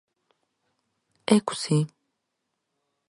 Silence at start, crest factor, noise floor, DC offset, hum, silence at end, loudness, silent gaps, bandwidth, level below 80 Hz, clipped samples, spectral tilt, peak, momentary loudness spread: 1.3 s; 26 dB; -80 dBFS; under 0.1%; none; 1.2 s; -25 LUFS; none; 11.5 kHz; -74 dBFS; under 0.1%; -5.5 dB/octave; -4 dBFS; 12 LU